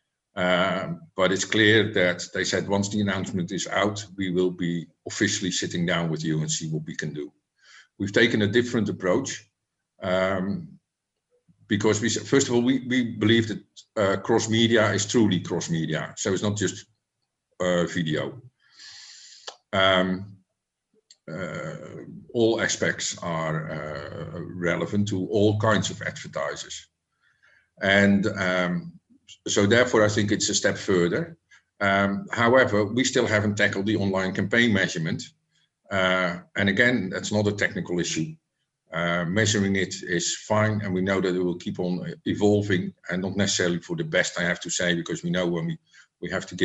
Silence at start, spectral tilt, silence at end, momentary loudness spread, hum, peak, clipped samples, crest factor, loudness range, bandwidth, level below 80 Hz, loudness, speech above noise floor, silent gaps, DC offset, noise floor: 0.35 s; -4.5 dB/octave; 0 s; 14 LU; none; -4 dBFS; under 0.1%; 22 dB; 5 LU; 9 kHz; -60 dBFS; -24 LUFS; 58 dB; none; under 0.1%; -82 dBFS